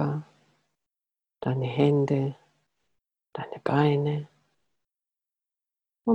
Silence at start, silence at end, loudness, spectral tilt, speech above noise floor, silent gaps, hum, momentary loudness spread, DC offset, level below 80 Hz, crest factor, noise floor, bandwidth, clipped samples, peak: 0 s; 0 s; -27 LUFS; -9 dB/octave; 64 dB; none; none; 16 LU; under 0.1%; -68 dBFS; 20 dB; -89 dBFS; 7 kHz; under 0.1%; -10 dBFS